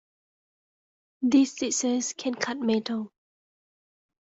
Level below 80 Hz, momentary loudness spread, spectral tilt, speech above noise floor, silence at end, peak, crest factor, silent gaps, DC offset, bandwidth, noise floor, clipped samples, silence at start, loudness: -72 dBFS; 10 LU; -3 dB/octave; over 64 dB; 1.25 s; -10 dBFS; 18 dB; none; under 0.1%; 8 kHz; under -90 dBFS; under 0.1%; 1.2 s; -26 LUFS